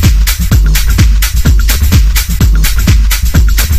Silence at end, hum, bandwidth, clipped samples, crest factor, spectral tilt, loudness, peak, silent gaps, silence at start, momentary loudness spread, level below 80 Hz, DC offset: 0 s; none; 16 kHz; 0.6%; 6 dB; -4 dB/octave; -10 LUFS; 0 dBFS; none; 0 s; 2 LU; -8 dBFS; under 0.1%